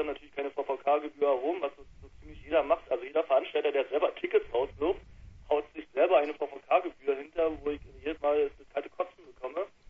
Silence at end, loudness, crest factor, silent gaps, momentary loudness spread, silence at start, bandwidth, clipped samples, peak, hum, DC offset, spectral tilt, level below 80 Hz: 0.25 s; -31 LUFS; 20 dB; none; 10 LU; 0 s; 6 kHz; under 0.1%; -10 dBFS; none; under 0.1%; -6.5 dB/octave; -56 dBFS